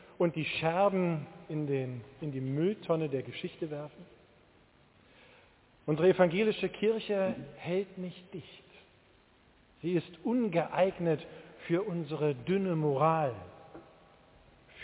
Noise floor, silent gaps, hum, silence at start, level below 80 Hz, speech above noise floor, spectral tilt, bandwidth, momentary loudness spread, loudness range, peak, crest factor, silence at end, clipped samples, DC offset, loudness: -64 dBFS; none; none; 0.2 s; -68 dBFS; 32 dB; -6 dB/octave; 4 kHz; 15 LU; 6 LU; -10 dBFS; 22 dB; 0 s; under 0.1%; under 0.1%; -32 LUFS